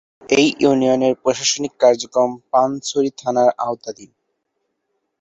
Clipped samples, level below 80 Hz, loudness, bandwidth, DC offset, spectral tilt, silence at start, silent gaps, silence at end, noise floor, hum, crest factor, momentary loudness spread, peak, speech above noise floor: under 0.1%; -60 dBFS; -17 LUFS; 8.2 kHz; under 0.1%; -3.5 dB/octave; 0.3 s; none; 1.15 s; -73 dBFS; none; 16 dB; 7 LU; -2 dBFS; 56 dB